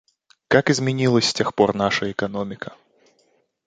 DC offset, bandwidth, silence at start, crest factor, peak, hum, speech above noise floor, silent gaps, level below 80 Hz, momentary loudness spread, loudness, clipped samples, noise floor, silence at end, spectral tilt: under 0.1%; 9.4 kHz; 0.5 s; 20 dB; -2 dBFS; none; 44 dB; none; -56 dBFS; 12 LU; -20 LUFS; under 0.1%; -64 dBFS; 0.95 s; -4.5 dB/octave